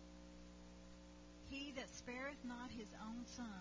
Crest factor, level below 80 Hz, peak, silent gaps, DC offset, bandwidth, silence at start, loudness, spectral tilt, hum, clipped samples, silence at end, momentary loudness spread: 18 dB; -66 dBFS; -34 dBFS; none; under 0.1%; 7.6 kHz; 0 s; -53 LUFS; -4 dB/octave; 60 Hz at -65 dBFS; under 0.1%; 0 s; 12 LU